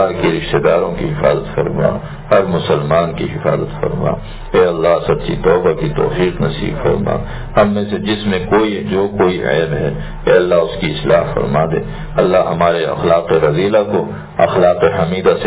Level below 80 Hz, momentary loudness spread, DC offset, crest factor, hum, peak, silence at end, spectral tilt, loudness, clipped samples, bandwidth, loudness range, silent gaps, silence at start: -32 dBFS; 6 LU; under 0.1%; 14 dB; none; 0 dBFS; 0 s; -11 dB/octave; -15 LUFS; under 0.1%; 4 kHz; 2 LU; none; 0 s